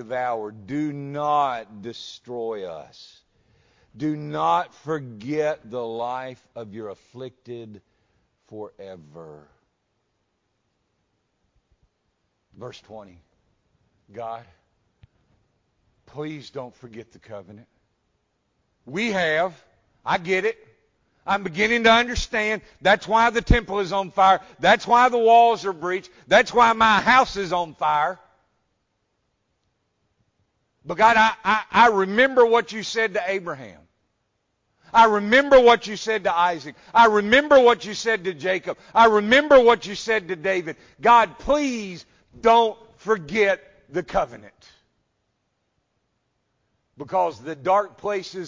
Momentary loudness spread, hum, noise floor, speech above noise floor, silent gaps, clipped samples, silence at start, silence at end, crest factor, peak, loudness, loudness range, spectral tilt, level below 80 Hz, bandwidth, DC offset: 22 LU; none; -73 dBFS; 52 dB; none; under 0.1%; 0 s; 0 s; 18 dB; -4 dBFS; -20 LUFS; 22 LU; -4.5 dB/octave; -42 dBFS; 7.6 kHz; under 0.1%